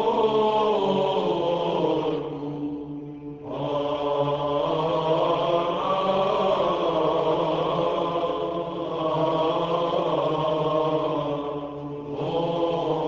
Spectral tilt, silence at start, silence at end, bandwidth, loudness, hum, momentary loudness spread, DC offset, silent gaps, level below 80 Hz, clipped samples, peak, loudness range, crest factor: -7 dB/octave; 0 s; 0 s; 7.6 kHz; -25 LUFS; none; 9 LU; under 0.1%; none; -56 dBFS; under 0.1%; -10 dBFS; 4 LU; 14 dB